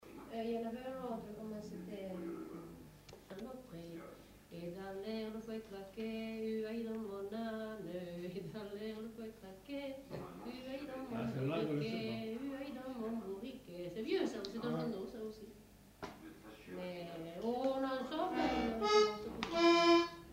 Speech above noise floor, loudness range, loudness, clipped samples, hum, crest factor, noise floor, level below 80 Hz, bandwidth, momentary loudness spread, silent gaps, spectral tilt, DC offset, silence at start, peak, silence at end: 19 dB; 11 LU; -40 LUFS; under 0.1%; none; 22 dB; -61 dBFS; -66 dBFS; 16 kHz; 18 LU; none; -5.5 dB/octave; under 0.1%; 0 s; -18 dBFS; 0 s